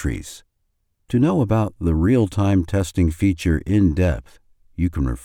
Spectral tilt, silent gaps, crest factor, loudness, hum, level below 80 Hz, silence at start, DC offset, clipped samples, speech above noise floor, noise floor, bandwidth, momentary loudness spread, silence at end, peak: -7.5 dB/octave; none; 14 dB; -20 LUFS; none; -32 dBFS; 0 s; under 0.1%; under 0.1%; 51 dB; -70 dBFS; 14.5 kHz; 9 LU; 0.05 s; -6 dBFS